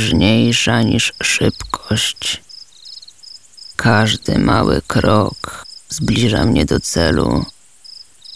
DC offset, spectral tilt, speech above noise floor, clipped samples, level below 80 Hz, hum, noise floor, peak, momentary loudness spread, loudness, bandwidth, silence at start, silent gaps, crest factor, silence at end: 1%; -4.5 dB/octave; 25 dB; under 0.1%; -32 dBFS; none; -40 dBFS; 0 dBFS; 22 LU; -15 LUFS; 11 kHz; 0 s; none; 16 dB; 0 s